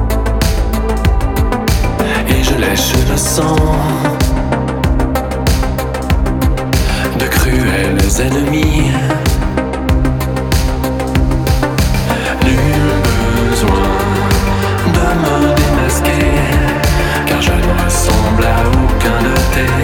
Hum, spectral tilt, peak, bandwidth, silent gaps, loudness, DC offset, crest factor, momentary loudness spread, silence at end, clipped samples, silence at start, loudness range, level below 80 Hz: none; -5 dB/octave; 0 dBFS; 19.5 kHz; none; -13 LUFS; under 0.1%; 12 dB; 3 LU; 0 s; under 0.1%; 0 s; 2 LU; -16 dBFS